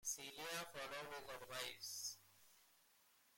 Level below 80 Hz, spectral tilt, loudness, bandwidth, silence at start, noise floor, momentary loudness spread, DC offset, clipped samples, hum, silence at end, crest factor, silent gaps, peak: -82 dBFS; -0.5 dB/octave; -49 LUFS; 16.5 kHz; 0 s; -75 dBFS; 20 LU; under 0.1%; under 0.1%; none; 0 s; 22 dB; none; -30 dBFS